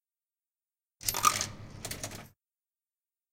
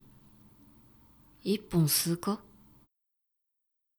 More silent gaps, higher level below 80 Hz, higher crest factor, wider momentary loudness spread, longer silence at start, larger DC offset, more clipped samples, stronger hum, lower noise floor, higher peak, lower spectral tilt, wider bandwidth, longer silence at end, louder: neither; first, -58 dBFS vs -64 dBFS; first, 30 dB vs 20 dB; first, 16 LU vs 12 LU; second, 1 s vs 1.45 s; neither; neither; neither; first, under -90 dBFS vs -83 dBFS; first, -8 dBFS vs -14 dBFS; second, -1 dB/octave vs -4.5 dB/octave; second, 17 kHz vs over 20 kHz; second, 1.05 s vs 1.6 s; about the same, -31 LUFS vs -30 LUFS